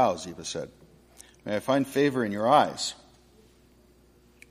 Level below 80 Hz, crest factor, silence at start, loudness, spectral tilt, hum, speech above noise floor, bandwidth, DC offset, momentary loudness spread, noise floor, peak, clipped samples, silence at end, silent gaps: -64 dBFS; 22 dB; 0 s; -26 LUFS; -4.5 dB/octave; none; 33 dB; 15.5 kHz; under 0.1%; 18 LU; -59 dBFS; -8 dBFS; under 0.1%; 1.55 s; none